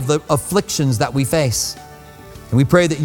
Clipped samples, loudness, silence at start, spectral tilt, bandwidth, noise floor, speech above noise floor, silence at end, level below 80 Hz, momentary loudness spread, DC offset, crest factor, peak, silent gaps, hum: under 0.1%; -17 LUFS; 0 s; -5 dB/octave; 18.5 kHz; -39 dBFS; 22 dB; 0 s; -42 dBFS; 6 LU; under 0.1%; 18 dB; 0 dBFS; none; none